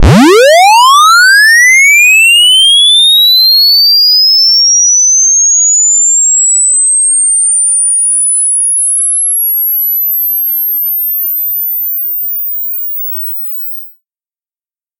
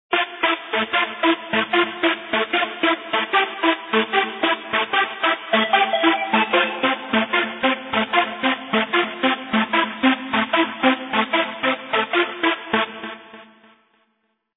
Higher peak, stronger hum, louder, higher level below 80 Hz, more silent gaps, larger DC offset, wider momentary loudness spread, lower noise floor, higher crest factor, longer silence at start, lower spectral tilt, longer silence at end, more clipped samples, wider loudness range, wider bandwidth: about the same, 0 dBFS vs -2 dBFS; neither; first, -4 LUFS vs -20 LUFS; first, -28 dBFS vs -64 dBFS; neither; neither; first, 10 LU vs 4 LU; first, under -90 dBFS vs -70 dBFS; second, 8 dB vs 18 dB; about the same, 0 s vs 0.1 s; second, -0.5 dB/octave vs -7 dB/octave; about the same, 1.1 s vs 1.1 s; neither; first, 9 LU vs 2 LU; first, 17 kHz vs 4.1 kHz